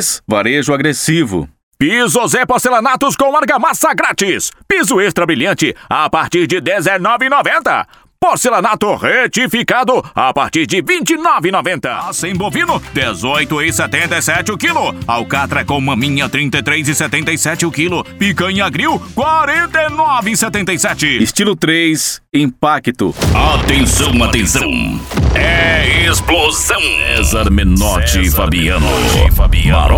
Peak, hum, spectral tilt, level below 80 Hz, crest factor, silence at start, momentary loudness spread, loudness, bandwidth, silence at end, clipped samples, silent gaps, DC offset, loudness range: 0 dBFS; none; -3.5 dB/octave; -22 dBFS; 12 dB; 0 s; 5 LU; -12 LUFS; 20 kHz; 0 s; under 0.1%; 1.63-1.71 s; under 0.1%; 3 LU